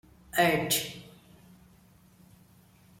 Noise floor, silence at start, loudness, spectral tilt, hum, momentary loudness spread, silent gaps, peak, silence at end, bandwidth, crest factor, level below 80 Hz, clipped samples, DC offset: -59 dBFS; 0.35 s; -27 LUFS; -3 dB/octave; none; 16 LU; none; -12 dBFS; 1.95 s; 16.5 kHz; 22 dB; -62 dBFS; under 0.1%; under 0.1%